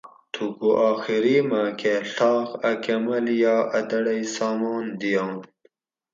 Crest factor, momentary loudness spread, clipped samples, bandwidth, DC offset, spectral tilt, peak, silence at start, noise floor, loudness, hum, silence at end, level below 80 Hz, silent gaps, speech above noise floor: 16 dB; 7 LU; under 0.1%; 7.6 kHz; under 0.1%; -5 dB/octave; -8 dBFS; 0.05 s; -63 dBFS; -23 LUFS; none; 0.7 s; -76 dBFS; none; 41 dB